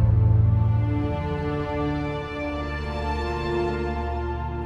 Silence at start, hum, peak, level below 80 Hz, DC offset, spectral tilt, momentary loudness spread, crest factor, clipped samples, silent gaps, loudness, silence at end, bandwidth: 0 s; none; -8 dBFS; -32 dBFS; under 0.1%; -8.5 dB/octave; 10 LU; 14 dB; under 0.1%; none; -25 LUFS; 0 s; 6.6 kHz